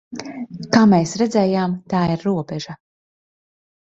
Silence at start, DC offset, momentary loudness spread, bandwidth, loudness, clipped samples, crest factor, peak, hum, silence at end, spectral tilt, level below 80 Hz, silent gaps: 0.1 s; under 0.1%; 18 LU; 8.2 kHz; -18 LUFS; under 0.1%; 18 dB; -2 dBFS; none; 1.05 s; -6.5 dB/octave; -54 dBFS; none